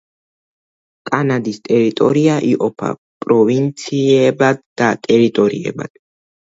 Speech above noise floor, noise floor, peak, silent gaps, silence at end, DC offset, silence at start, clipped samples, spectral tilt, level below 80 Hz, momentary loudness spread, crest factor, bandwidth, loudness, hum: over 76 dB; under -90 dBFS; 0 dBFS; 2.98-3.21 s, 4.66-4.76 s; 0.7 s; under 0.1%; 1.05 s; under 0.1%; -6.5 dB/octave; -60 dBFS; 11 LU; 16 dB; 7.8 kHz; -15 LUFS; none